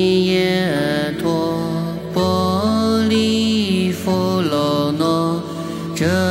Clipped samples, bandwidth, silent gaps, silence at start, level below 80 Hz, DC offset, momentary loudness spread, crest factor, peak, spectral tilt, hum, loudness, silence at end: under 0.1%; 16.5 kHz; none; 0 s; -48 dBFS; under 0.1%; 6 LU; 14 dB; -4 dBFS; -6 dB/octave; none; -18 LUFS; 0 s